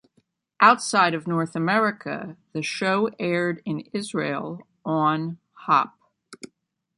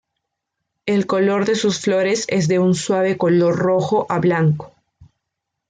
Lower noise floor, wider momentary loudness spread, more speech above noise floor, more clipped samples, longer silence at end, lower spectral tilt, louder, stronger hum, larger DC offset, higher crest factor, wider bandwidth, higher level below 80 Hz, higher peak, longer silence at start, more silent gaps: second, -68 dBFS vs -79 dBFS; first, 16 LU vs 4 LU; second, 45 dB vs 62 dB; neither; second, 0.5 s vs 0.65 s; about the same, -5 dB/octave vs -6 dB/octave; second, -23 LUFS vs -18 LUFS; neither; neither; first, 22 dB vs 12 dB; first, 11.5 kHz vs 9.4 kHz; second, -72 dBFS vs -58 dBFS; first, -2 dBFS vs -6 dBFS; second, 0.6 s vs 0.85 s; neither